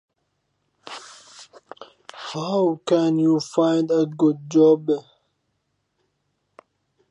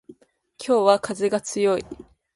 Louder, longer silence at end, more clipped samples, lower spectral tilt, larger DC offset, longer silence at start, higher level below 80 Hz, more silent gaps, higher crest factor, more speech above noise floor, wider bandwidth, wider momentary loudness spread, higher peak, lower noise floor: about the same, -20 LUFS vs -22 LUFS; first, 2.1 s vs 0.35 s; neither; first, -6.5 dB/octave vs -4 dB/octave; neither; first, 0.85 s vs 0.1 s; second, -76 dBFS vs -60 dBFS; neither; about the same, 18 dB vs 20 dB; first, 54 dB vs 32 dB; second, 10 kHz vs 11.5 kHz; about the same, 21 LU vs 19 LU; second, -6 dBFS vs -2 dBFS; first, -73 dBFS vs -53 dBFS